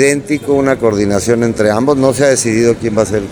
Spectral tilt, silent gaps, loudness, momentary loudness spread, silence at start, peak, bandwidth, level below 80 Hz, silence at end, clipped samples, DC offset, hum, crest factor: -5 dB/octave; none; -12 LUFS; 4 LU; 0 s; 0 dBFS; over 20 kHz; -40 dBFS; 0 s; under 0.1%; under 0.1%; none; 12 dB